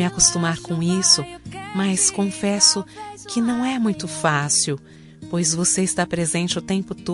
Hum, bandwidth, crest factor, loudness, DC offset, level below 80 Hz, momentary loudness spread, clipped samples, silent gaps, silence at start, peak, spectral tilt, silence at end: none; 11.5 kHz; 20 dB; -19 LUFS; under 0.1%; -50 dBFS; 13 LU; under 0.1%; none; 0 s; -2 dBFS; -3 dB/octave; 0 s